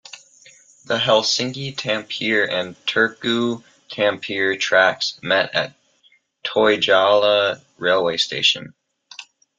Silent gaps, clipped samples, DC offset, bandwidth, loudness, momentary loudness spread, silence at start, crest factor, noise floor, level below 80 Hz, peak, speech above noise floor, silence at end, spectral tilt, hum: none; under 0.1%; under 0.1%; 9.2 kHz; -19 LUFS; 11 LU; 0.15 s; 18 dB; -59 dBFS; -66 dBFS; -2 dBFS; 40 dB; 0.35 s; -3 dB/octave; none